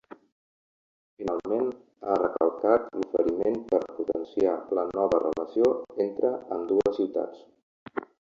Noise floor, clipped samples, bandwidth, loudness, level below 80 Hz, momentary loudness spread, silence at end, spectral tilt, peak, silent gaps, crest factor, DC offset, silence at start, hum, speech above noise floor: under -90 dBFS; under 0.1%; 7.4 kHz; -27 LUFS; -62 dBFS; 9 LU; 0.25 s; -7.5 dB/octave; -6 dBFS; 7.63-7.86 s; 20 dB; under 0.1%; 1.2 s; none; over 64 dB